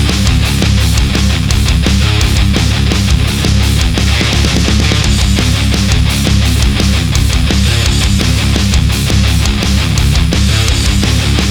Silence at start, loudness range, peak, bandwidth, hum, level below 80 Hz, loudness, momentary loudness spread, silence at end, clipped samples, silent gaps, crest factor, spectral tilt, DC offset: 0 s; 0 LU; 0 dBFS; 18.5 kHz; none; -14 dBFS; -11 LUFS; 1 LU; 0 s; under 0.1%; none; 10 dB; -4.5 dB/octave; under 0.1%